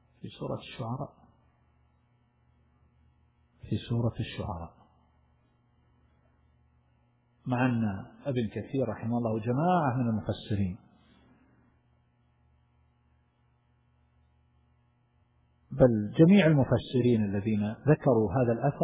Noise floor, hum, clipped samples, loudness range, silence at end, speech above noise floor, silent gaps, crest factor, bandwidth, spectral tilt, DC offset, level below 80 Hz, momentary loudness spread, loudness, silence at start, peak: -69 dBFS; none; under 0.1%; 17 LU; 0 s; 42 dB; none; 22 dB; 4 kHz; -7.5 dB/octave; under 0.1%; -54 dBFS; 15 LU; -28 LUFS; 0.25 s; -10 dBFS